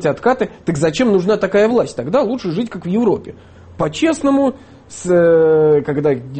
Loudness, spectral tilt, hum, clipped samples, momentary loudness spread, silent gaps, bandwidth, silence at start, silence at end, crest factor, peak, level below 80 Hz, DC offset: -15 LUFS; -6.5 dB/octave; none; under 0.1%; 10 LU; none; 8.8 kHz; 0 s; 0 s; 12 dB; -4 dBFS; -48 dBFS; under 0.1%